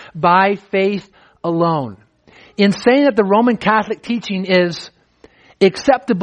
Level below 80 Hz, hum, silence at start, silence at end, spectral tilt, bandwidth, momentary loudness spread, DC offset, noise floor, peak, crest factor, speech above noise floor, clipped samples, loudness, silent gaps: -56 dBFS; none; 0 s; 0 s; -6 dB/octave; 9.8 kHz; 10 LU; under 0.1%; -49 dBFS; 0 dBFS; 16 dB; 34 dB; under 0.1%; -16 LUFS; none